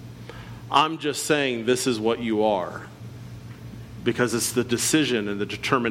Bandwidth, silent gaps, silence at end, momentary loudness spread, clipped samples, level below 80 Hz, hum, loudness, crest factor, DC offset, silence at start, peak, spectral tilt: 17 kHz; none; 0 s; 19 LU; under 0.1%; -54 dBFS; none; -23 LUFS; 20 dB; under 0.1%; 0 s; -6 dBFS; -3.5 dB/octave